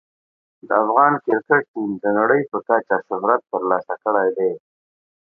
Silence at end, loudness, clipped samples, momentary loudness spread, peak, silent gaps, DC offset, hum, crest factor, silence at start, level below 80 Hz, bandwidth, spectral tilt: 0.65 s; -19 LUFS; under 0.1%; 8 LU; 0 dBFS; 1.68-1.74 s; under 0.1%; none; 20 dB; 0.65 s; -72 dBFS; 2.8 kHz; -10.5 dB/octave